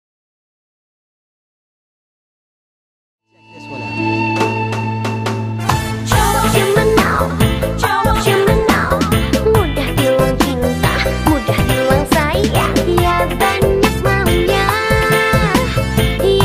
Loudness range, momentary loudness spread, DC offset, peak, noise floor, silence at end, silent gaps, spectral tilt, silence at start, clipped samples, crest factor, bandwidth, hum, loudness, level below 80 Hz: 7 LU; 6 LU; 0.1%; 0 dBFS; -38 dBFS; 0 s; none; -5 dB/octave; 3.55 s; under 0.1%; 14 dB; 15.5 kHz; none; -14 LUFS; -26 dBFS